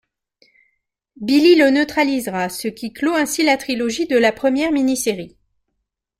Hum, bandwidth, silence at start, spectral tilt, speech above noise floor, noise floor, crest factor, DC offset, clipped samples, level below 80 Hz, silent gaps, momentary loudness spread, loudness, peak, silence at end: none; 16 kHz; 1.2 s; -3.5 dB/octave; 59 dB; -76 dBFS; 16 dB; under 0.1%; under 0.1%; -56 dBFS; none; 13 LU; -17 LUFS; -2 dBFS; 0.9 s